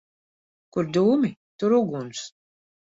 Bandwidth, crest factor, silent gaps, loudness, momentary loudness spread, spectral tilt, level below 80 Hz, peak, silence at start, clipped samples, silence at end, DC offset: 7.8 kHz; 16 dB; 1.37-1.59 s; -24 LUFS; 14 LU; -6.5 dB/octave; -68 dBFS; -10 dBFS; 0.75 s; under 0.1%; 0.6 s; under 0.1%